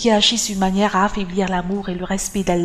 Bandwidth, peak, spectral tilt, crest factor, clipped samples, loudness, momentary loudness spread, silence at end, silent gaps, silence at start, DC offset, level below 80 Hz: 14.5 kHz; -2 dBFS; -4 dB/octave; 16 dB; under 0.1%; -19 LUFS; 9 LU; 0 s; none; 0 s; under 0.1%; -38 dBFS